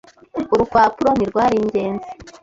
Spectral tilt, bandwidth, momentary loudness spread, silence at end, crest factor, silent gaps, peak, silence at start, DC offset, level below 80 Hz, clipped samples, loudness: -6.5 dB/octave; 7.8 kHz; 14 LU; 0.15 s; 16 dB; none; -2 dBFS; 0.35 s; under 0.1%; -46 dBFS; under 0.1%; -18 LUFS